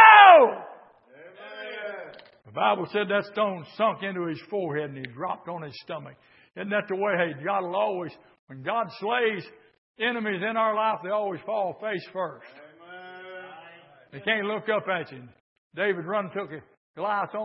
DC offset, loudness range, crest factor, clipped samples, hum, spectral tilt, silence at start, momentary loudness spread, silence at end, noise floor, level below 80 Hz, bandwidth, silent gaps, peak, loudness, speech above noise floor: under 0.1%; 4 LU; 24 dB; under 0.1%; none; -8.5 dB/octave; 0 s; 17 LU; 0 s; -52 dBFS; -80 dBFS; 5.8 kHz; 8.39-8.47 s, 9.78-9.94 s, 15.40-15.71 s, 16.77-16.94 s; -2 dBFS; -24 LUFS; 23 dB